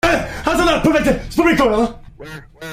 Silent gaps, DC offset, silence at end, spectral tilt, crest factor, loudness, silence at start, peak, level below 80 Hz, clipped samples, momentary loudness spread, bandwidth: none; under 0.1%; 0 s; -5 dB/octave; 14 dB; -16 LUFS; 0.05 s; -2 dBFS; -32 dBFS; under 0.1%; 21 LU; 16 kHz